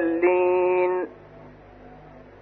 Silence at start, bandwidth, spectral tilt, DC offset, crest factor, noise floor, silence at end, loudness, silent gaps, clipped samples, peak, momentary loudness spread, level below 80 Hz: 0 s; 4 kHz; -9.5 dB/octave; under 0.1%; 16 dB; -46 dBFS; 0.2 s; -22 LUFS; none; under 0.1%; -10 dBFS; 9 LU; -58 dBFS